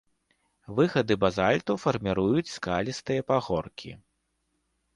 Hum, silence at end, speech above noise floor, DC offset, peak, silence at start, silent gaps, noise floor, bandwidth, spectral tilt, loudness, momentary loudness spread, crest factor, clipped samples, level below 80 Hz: none; 1 s; 49 dB; under 0.1%; -8 dBFS; 0.7 s; none; -76 dBFS; 11.5 kHz; -6 dB/octave; -27 LUFS; 9 LU; 20 dB; under 0.1%; -54 dBFS